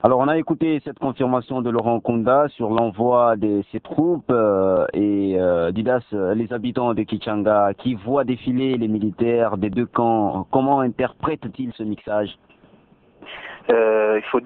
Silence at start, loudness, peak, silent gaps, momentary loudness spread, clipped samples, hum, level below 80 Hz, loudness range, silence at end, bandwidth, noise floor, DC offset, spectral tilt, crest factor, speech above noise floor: 0.05 s; -20 LUFS; 0 dBFS; none; 8 LU; under 0.1%; none; -54 dBFS; 4 LU; 0 s; 4.4 kHz; -53 dBFS; under 0.1%; -11 dB/octave; 20 dB; 34 dB